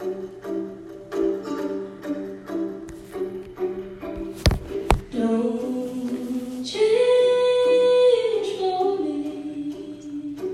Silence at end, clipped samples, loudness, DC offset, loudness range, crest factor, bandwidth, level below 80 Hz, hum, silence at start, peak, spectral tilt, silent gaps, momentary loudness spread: 0 s; under 0.1%; -24 LUFS; under 0.1%; 10 LU; 22 dB; 13.5 kHz; -38 dBFS; none; 0 s; 0 dBFS; -6 dB/octave; none; 15 LU